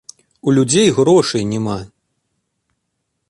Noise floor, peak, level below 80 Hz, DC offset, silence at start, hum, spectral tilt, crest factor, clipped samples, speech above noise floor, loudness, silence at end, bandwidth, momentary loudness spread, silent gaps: -72 dBFS; -2 dBFS; -52 dBFS; under 0.1%; 0.45 s; none; -5 dB/octave; 16 dB; under 0.1%; 59 dB; -15 LUFS; 1.45 s; 11.5 kHz; 11 LU; none